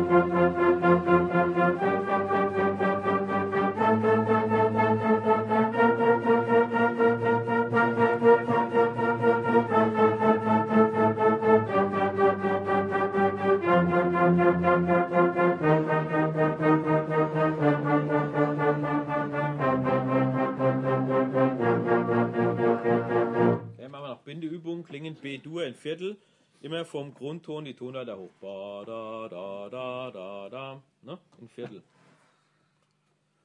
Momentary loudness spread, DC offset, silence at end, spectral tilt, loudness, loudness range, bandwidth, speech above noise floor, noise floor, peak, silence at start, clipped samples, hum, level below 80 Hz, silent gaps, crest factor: 16 LU; under 0.1%; 1.65 s; -8.5 dB/octave; -24 LUFS; 15 LU; 9.2 kHz; 41 dB; -72 dBFS; -8 dBFS; 0 s; under 0.1%; none; -66 dBFS; none; 18 dB